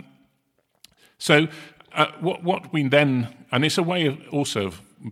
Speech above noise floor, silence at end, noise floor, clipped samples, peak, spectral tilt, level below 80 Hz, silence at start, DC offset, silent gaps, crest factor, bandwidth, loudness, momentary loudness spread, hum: 48 dB; 0 s; -70 dBFS; under 0.1%; -2 dBFS; -5 dB/octave; -66 dBFS; 1.2 s; under 0.1%; none; 22 dB; 15.5 kHz; -22 LUFS; 12 LU; none